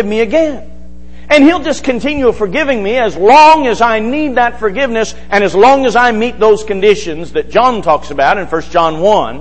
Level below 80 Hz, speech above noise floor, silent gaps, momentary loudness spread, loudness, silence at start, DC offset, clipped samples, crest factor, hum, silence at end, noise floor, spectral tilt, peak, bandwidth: -34 dBFS; 23 dB; none; 8 LU; -10 LUFS; 0 s; 6%; 0.4%; 10 dB; none; 0 s; -34 dBFS; -4.5 dB/octave; 0 dBFS; 8.8 kHz